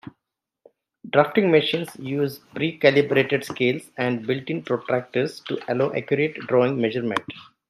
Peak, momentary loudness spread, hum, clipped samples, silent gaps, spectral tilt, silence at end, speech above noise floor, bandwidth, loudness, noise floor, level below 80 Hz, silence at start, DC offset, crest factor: -2 dBFS; 9 LU; none; under 0.1%; none; -6.5 dB/octave; 0.25 s; 61 dB; 13.5 kHz; -23 LUFS; -83 dBFS; -68 dBFS; 0.05 s; under 0.1%; 22 dB